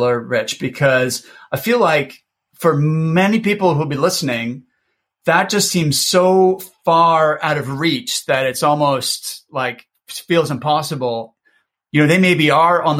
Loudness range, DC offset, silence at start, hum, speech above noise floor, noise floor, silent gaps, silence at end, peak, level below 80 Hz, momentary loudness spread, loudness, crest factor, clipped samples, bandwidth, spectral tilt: 4 LU; under 0.1%; 0 s; none; 54 dB; -70 dBFS; none; 0 s; -2 dBFS; -58 dBFS; 11 LU; -16 LUFS; 16 dB; under 0.1%; 16.5 kHz; -4.5 dB/octave